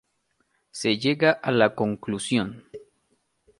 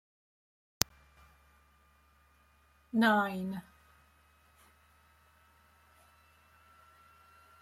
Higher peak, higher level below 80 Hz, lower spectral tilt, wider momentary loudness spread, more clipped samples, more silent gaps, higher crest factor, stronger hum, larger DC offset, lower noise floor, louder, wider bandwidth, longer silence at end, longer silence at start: second, -4 dBFS vs 0 dBFS; about the same, -64 dBFS vs -66 dBFS; first, -5 dB/octave vs -3.5 dB/octave; about the same, 13 LU vs 13 LU; neither; neither; second, 22 dB vs 38 dB; neither; neither; first, -72 dBFS vs -67 dBFS; first, -24 LUFS vs -32 LUFS; second, 11.5 kHz vs 16.5 kHz; second, 0.8 s vs 4 s; second, 0.75 s vs 2.95 s